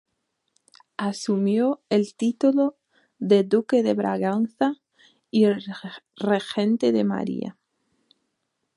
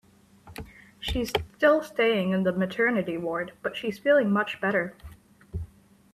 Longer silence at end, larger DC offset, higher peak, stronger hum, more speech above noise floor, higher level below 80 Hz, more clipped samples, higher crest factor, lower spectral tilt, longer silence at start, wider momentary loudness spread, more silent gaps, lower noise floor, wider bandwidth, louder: first, 1.25 s vs 0.5 s; neither; about the same, -6 dBFS vs -8 dBFS; neither; first, 55 dB vs 27 dB; second, -72 dBFS vs -48 dBFS; neither; about the same, 18 dB vs 20 dB; about the same, -6.5 dB/octave vs -6 dB/octave; first, 1 s vs 0.45 s; second, 12 LU vs 21 LU; neither; first, -77 dBFS vs -53 dBFS; second, 11.5 kHz vs 14 kHz; first, -23 LUFS vs -26 LUFS